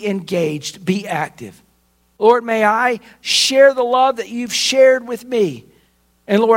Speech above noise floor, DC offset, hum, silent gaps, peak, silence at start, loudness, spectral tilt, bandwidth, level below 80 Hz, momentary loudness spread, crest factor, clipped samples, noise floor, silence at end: 44 dB; under 0.1%; none; none; 0 dBFS; 0 s; -16 LUFS; -3.5 dB/octave; 16.5 kHz; -62 dBFS; 11 LU; 16 dB; under 0.1%; -59 dBFS; 0 s